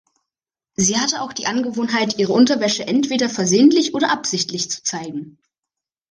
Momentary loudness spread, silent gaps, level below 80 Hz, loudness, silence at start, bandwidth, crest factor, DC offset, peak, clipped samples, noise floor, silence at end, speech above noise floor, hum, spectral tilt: 10 LU; none; -60 dBFS; -18 LUFS; 0.8 s; 10.5 kHz; 18 dB; under 0.1%; -2 dBFS; under 0.1%; -87 dBFS; 0.85 s; 69 dB; none; -3 dB/octave